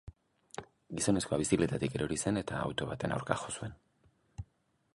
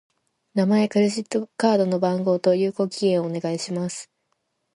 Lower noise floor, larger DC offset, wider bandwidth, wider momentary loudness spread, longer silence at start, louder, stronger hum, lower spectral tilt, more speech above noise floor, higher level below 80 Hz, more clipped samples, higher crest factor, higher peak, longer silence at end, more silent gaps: about the same, -72 dBFS vs -74 dBFS; neither; about the same, 11.5 kHz vs 11.5 kHz; first, 19 LU vs 8 LU; second, 0.05 s vs 0.55 s; second, -34 LUFS vs -22 LUFS; neither; about the same, -5 dB/octave vs -6 dB/octave; second, 39 dB vs 52 dB; first, -56 dBFS vs -70 dBFS; neither; first, 26 dB vs 18 dB; second, -10 dBFS vs -6 dBFS; second, 0.5 s vs 0.7 s; neither